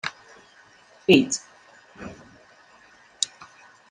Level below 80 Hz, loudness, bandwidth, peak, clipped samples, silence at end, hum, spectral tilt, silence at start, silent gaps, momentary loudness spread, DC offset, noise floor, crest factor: -66 dBFS; -23 LUFS; 11.5 kHz; -2 dBFS; under 0.1%; 0.65 s; none; -3.5 dB/octave; 0.05 s; none; 23 LU; under 0.1%; -54 dBFS; 26 dB